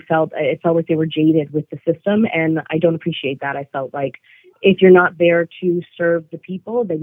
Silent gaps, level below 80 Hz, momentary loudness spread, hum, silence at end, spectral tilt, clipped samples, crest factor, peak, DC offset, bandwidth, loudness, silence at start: none; -66 dBFS; 13 LU; none; 0 s; -10 dB/octave; under 0.1%; 18 dB; 0 dBFS; under 0.1%; 3.8 kHz; -17 LUFS; 0.1 s